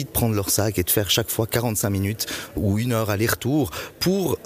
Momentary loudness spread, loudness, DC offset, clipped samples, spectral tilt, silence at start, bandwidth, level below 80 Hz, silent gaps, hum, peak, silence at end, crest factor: 5 LU; -22 LUFS; under 0.1%; under 0.1%; -4.5 dB/octave; 0 s; 15.5 kHz; -44 dBFS; none; none; -6 dBFS; 0 s; 16 dB